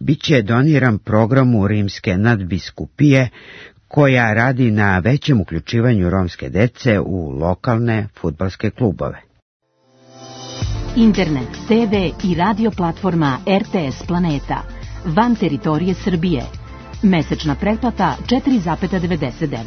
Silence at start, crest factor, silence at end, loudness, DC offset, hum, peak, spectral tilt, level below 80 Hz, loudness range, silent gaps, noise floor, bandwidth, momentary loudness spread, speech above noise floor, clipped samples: 0 s; 16 dB; 0 s; -17 LUFS; under 0.1%; none; 0 dBFS; -7.5 dB/octave; -36 dBFS; 5 LU; 9.42-9.60 s; -52 dBFS; 6.6 kHz; 11 LU; 36 dB; under 0.1%